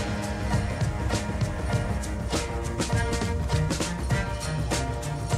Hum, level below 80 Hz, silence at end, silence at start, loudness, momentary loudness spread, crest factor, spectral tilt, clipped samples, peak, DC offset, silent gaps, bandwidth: none; -34 dBFS; 0 s; 0 s; -28 LUFS; 4 LU; 16 dB; -5 dB/octave; under 0.1%; -12 dBFS; under 0.1%; none; 15 kHz